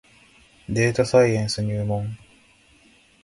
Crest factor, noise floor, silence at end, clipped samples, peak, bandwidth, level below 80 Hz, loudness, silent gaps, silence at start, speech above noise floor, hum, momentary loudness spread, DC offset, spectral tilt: 20 dB; -56 dBFS; 1.1 s; under 0.1%; -4 dBFS; 11.5 kHz; -50 dBFS; -22 LUFS; none; 0.7 s; 35 dB; none; 18 LU; under 0.1%; -6 dB/octave